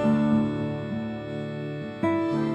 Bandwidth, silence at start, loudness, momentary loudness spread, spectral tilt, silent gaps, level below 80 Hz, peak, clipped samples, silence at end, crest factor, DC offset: 8.4 kHz; 0 s; -27 LUFS; 10 LU; -8.5 dB/octave; none; -56 dBFS; -12 dBFS; under 0.1%; 0 s; 14 dB; under 0.1%